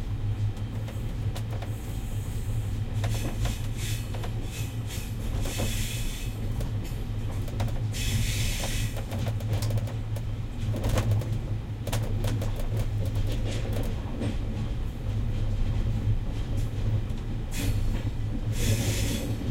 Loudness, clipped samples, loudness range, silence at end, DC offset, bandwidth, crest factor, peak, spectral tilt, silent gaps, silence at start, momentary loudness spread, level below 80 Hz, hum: -31 LUFS; under 0.1%; 2 LU; 0 s; under 0.1%; 16.5 kHz; 16 dB; -12 dBFS; -5.5 dB/octave; none; 0 s; 6 LU; -32 dBFS; none